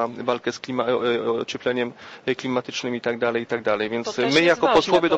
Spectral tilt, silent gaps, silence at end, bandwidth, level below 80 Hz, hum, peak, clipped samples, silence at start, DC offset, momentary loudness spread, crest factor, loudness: -4.5 dB/octave; none; 0 s; 8.6 kHz; -58 dBFS; none; -6 dBFS; under 0.1%; 0 s; under 0.1%; 10 LU; 16 dB; -23 LUFS